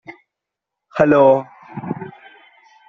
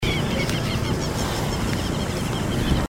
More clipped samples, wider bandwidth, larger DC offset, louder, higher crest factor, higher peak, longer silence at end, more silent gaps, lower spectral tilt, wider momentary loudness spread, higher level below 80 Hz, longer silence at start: neither; second, 6.6 kHz vs 16.5 kHz; neither; first, -15 LUFS vs -24 LUFS; about the same, 18 dB vs 16 dB; first, -2 dBFS vs -6 dBFS; first, 0.8 s vs 0 s; neither; first, -6.5 dB/octave vs -5 dB/octave; first, 21 LU vs 2 LU; second, -58 dBFS vs -32 dBFS; about the same, 0.1 s vs 0 s